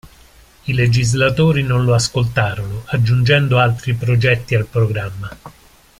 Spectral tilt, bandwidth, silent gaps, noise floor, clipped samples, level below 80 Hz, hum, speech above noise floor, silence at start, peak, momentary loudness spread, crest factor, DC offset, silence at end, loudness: -5.5 dB/octave; 13 kHz; none; -46 dBFS; under 0.1%; -40 dBFS; none; 31 dB; 0.05 s; 0 dBFS; 11 LU; 16 dB; under 0.1%; 0.5 s; -16 LUFS